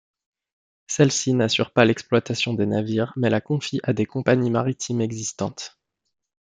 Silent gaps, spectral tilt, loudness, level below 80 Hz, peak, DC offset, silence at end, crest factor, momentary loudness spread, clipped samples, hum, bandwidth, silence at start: none; -5 dB/octave; -22 LUFS; -64 dBFS; -4 dBFS; under 0.1%; 0.9 s; 20 dB; 9 LU; under 0.1%; none; 9.6 kHz; 0.9 s